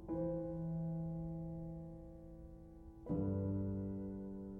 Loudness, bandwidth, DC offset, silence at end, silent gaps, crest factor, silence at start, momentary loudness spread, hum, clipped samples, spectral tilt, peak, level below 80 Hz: -43 LUFS; 2.1 kHz; under 0.1%; 0 s; none; 14 dB; 0 s; 16 LU; none; under 0.1%; -12.5 dB/octave; -30 dBFS; -58 dBFS